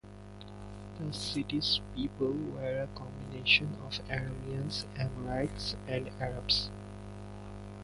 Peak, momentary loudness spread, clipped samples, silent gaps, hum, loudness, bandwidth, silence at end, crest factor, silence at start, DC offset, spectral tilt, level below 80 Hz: -12 dBFS; 17 LU; under 0.1%; none; 50 Hz at -50 dBFS; -33 LUFS; 11.5 kHz; 0 s; 24 dB; 0.05 s; under 0.1%; -5 dB/octave; -50 dBFS